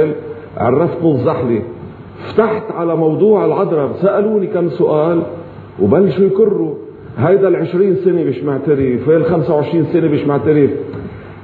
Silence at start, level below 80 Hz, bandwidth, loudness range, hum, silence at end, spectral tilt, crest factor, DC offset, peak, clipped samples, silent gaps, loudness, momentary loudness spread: 0 s; -50 dBFS; 4.6 kHz; 1 LU; none; 0 s; -11.5 dB/octave; 14 dB; under 0.1%; 0 dBFS; under 0.1%; none; -14 LUFS; 14 LU